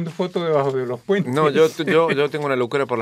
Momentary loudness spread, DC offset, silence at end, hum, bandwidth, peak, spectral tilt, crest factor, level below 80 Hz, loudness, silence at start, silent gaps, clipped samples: 6 LU; under 0.1%; 0 s; none; 15 kHz; -6 dBFS; -6 dB/octave; 14 dB; -68 dBFS; -20 LUFS; 0 s; none; under 0.1%